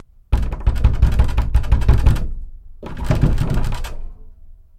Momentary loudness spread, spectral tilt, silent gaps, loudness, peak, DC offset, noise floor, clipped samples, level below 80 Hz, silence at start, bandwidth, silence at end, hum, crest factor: 18 LU; -7.5 dB/octave; none; -20 LUFS; -2 dBFS; under 0.1%; -40 dBFS; under 0.1%; -18 dBFS; 0.3 s; 13.5 kHz; 0.25 s; none; 16 dB